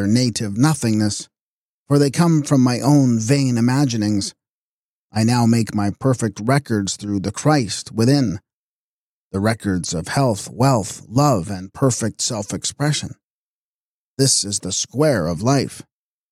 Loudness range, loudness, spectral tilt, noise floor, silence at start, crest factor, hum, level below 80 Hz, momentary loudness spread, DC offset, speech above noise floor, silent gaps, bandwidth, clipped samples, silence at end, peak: 4 LU; -19 LUFS; -5 dB/octave; under -90 dBFS; 0 s; 16 dB; none; -52 dBFS; 8 LU; under 0.1%; over 72 dB; 1.41-1.86 s, 4.49-5.10 s, 8.53-9.31 s, 13.23-14.17 s; 15 kHz; under 0.1%; 0.5 s; -4 dBFS